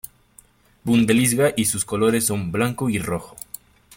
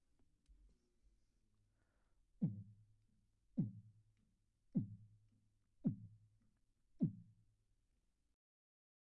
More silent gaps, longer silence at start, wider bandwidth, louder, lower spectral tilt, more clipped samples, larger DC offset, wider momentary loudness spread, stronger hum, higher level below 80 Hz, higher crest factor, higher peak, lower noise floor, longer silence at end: neither; first, 0.85 s vs 0.5 s; first, 17 kHz vs 2.2 kHz; first, -20 LUFS vs -46 LUFS; second, -4.5 dB/octave vs -15 dB/octave; neither; neither; about the same, 19 LU vs 19 LU; neither; first, -52 dBFS vs -78 dBFS; second, 16 dB vs 24 dB; first, -6 dBFS vs -28 dBFS; second, -53 dBFS vs -82 dBFS; second, 0.65 s vs 1.8 s